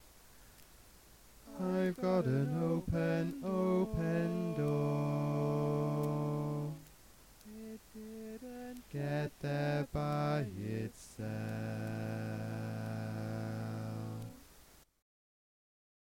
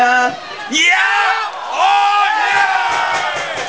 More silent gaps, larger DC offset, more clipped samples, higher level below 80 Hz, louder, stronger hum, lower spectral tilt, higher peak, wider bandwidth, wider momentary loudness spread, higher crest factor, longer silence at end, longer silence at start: neither; second, under 0.1% vs 0.4%; neither; about the same, -60 dBFS vs -58 dBFS; second, -37 LUFS vs -13 LUFS; neither; first, -7.5 dB/octave vs -0.5 dB/octave; second, -20 dBFS vs 0 dBFS; first, 17 kHz vs 8 kHz; first, 14 LU vs 8 LU; about the same, 18 dB vs 14 dB; first, 1.25 s vs 0 s; about the same, 0 s vs 0 s